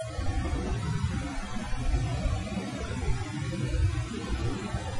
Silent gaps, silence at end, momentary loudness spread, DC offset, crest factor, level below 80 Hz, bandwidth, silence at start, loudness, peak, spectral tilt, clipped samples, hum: none; 0 s; 5 LU; under 0.1%; 14 dB; -34 dBFS; 11.5 kHz; 0 s; -32 LUFS; -14 dBFS; -6 dB/octave; under 0.1%; none